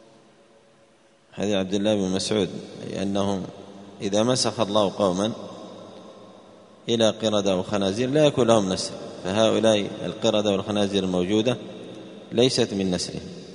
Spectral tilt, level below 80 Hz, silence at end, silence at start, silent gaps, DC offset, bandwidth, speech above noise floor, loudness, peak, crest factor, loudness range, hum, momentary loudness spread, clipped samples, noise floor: -5 dB/octave; -60 dBFS; 0 s; 1.35 s; none; under 0.1%; 10.5 kHz; 35 dB; -23 LUFS; -2 dBFS; 22 dB; 5 LU; none; 18 LU; under 0.1%; -57 dBFS